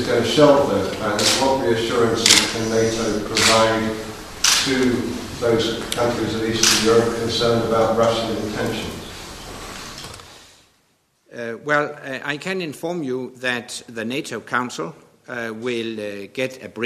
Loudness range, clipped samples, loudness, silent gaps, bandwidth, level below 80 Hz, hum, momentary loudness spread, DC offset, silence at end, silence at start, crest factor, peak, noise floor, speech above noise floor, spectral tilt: 11 LU; under 0.1%; -19 LUFS; none; 14 kHz; -46 dBFS; none; 18 LU; under 0.1%; 0 s; 0 s; 20 dB; 0 dBFS; -63 dBFS; 43 dB; -3 dB/octave